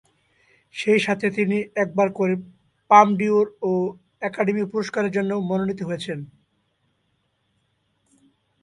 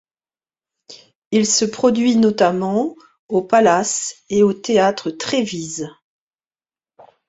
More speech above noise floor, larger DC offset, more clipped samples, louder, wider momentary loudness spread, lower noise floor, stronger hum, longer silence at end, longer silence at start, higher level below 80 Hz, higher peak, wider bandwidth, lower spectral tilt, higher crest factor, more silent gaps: second, 49 dB vs over 73 dB; neither; neither; second, -22 LUFS vs -17 LUFS; first, 14 LU vs 11 LU; second, -70 dBFS vs under -90 dBFS; neither; first, 2.35 s vs 1.4 s; second, 0.75 s vs 0.9 s; second, -66 dBFS vs -60 dBFS; about the same, 0 dBFS vs -2 dBFS; first, 11 kHz vs 8 kHz; first, -6.5 dB/octave vs -4 dB/octave; about the same, 22 dB vs 18 dB; second, none vs 1.15-1.31 s, 3.19-3.29 s